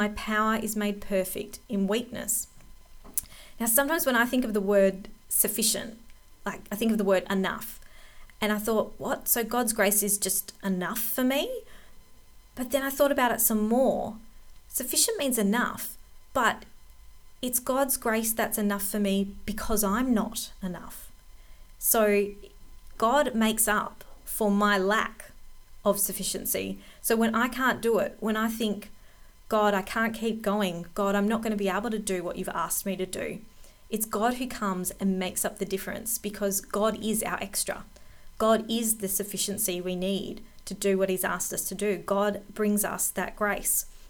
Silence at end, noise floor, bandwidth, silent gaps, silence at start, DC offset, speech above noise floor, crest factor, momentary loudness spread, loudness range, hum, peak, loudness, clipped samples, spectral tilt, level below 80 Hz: 0 s; -51 dBFS; over 20 kHz; none; 0 s; under 0.1%; 24 dB; 24 dB; 11 LU; 4 LU; none; -4 dBFS; -27 LUFS; under 0.1%; -3.5 dB/octave; -50 dBFS